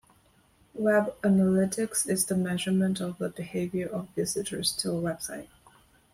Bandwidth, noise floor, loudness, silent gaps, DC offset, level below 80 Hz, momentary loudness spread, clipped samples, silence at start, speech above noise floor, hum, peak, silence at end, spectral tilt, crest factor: 16 kHz; -63 dBFS; -28 LUFS; none; under 0.1%; -62 dBFS; 9 LU; under 0.1%; 0.75 s; 35 dB; none; -12 dBFS; 0.65 s; -4.5 dB/octave; 16 dB